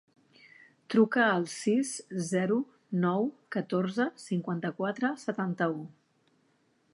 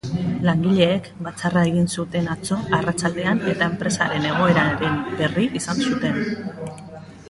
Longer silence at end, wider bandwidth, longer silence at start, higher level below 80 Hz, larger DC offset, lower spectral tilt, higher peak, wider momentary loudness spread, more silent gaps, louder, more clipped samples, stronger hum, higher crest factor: first, 1.05 s vs 0 s; about the same, 11.5 kHz vs 11.5 kHz; first, 0.9 s vs 0.05 s; second, -82 dBFS vs -50 dBFS; neither; about the same, -5.5 dB/octave vs -5.5 dB/octave; second, -12 dBFS vs -4 dBFS; about the same, 9 LU vs 10 LU; neither; second, -30 LUFS vs -21 LUFS; neither; neither; about the same, 20 dB vs 18 dB